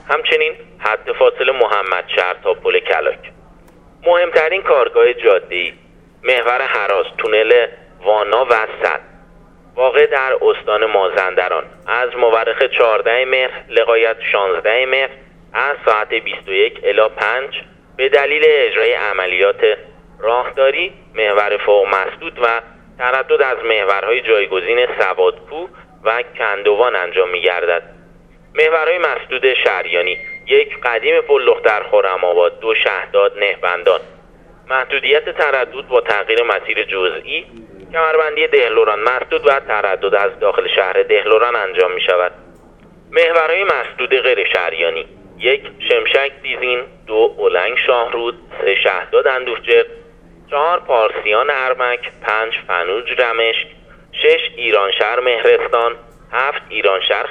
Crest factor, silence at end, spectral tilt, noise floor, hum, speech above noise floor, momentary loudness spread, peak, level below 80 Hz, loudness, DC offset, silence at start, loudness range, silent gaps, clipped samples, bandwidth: 16 dB; 0 s; -4 dB/octave; -44 dBFS; none; 29 dB; 7 LU; 0 dBFS; -50 dBFS; -15 LUFS; under 0.1%; 0.05 s; 2 LU; none; under 0.1%; 6.2 kHz